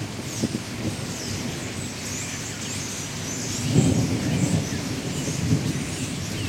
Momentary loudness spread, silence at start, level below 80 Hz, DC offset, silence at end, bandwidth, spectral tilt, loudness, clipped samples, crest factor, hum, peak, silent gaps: 8 LU; 0 s; -48 dBFS; under 0.1%; 0 s; 16.5 kHz; -4.5 dB/octave; -26 LUFS; under 0.1%; 22 dB; none; -6 dBFS; none